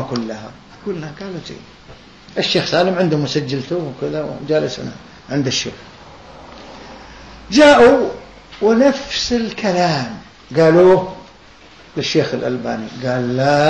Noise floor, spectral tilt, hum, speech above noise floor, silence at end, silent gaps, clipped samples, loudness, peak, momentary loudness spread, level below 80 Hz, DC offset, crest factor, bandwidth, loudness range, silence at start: -43 dBFS; -5 dB/octave; none; 27 dB; 0 s; none; under 0.1%; -16 LUFS; 0 dBFS; 25 LU; -46 dBFS; 0.2%; 16 dB; 9.2 kHz; 8 LU; 0 s